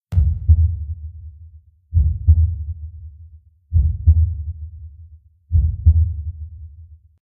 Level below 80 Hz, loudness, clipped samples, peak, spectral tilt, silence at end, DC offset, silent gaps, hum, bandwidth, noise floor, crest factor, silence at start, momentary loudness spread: -22 dBFS; -19 LUFS; under 0.1%; -2 dBFS; -13 dB/octave; 0.3 s; under 0.1%; none; none; 0.7 kHz; -45 dBFS; 16 dB; 0.1 s; 23 LU